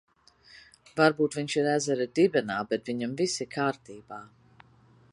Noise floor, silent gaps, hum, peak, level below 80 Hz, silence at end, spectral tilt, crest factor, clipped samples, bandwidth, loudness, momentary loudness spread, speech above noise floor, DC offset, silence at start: -59 dBFS; none; none; -6 dBFS; -70 dBFS; 0.9 s; -4.5 dB/octave; 24 dB; under 0.1%; 11.5 kHz; -27 LUFS; 19 LU; 32 dB; under 0.1%; 0.55 s